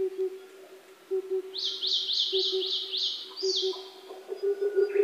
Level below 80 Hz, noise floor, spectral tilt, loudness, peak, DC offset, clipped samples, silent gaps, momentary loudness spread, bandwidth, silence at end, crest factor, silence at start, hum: under -90 dBFS; -51 dBFS; -0.5 dB/octave; -28 LUFS; -14 dBFS; under 0.1%; under 0.1%; none; 15 LU; 15 kHz; 0 s; 16 dB; 0 s; none